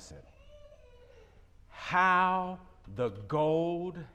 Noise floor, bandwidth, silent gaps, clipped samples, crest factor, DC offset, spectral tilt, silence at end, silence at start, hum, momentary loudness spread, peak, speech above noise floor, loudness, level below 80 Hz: -57 dBFS; 9.6 kHz; none; under 0.1%; 20 dB; under 0.1%; -6 dB/octave; 0.1 s; 0 s; none; 20 LU; -14 dBFS; 27 dB; -30 LUFS; -60 dBFS